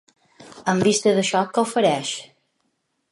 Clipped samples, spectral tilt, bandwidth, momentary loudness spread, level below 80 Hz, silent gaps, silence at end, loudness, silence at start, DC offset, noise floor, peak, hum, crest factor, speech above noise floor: under 0.1%; -4 dB/octave; 11.5 kHz; 11 LU; -66 dBFS; none; 0.85 s; -20 LUFS; 0.4 s; under 0.1%; -72 dBFS; -6 dBFS; none; 18 dB; 53 dB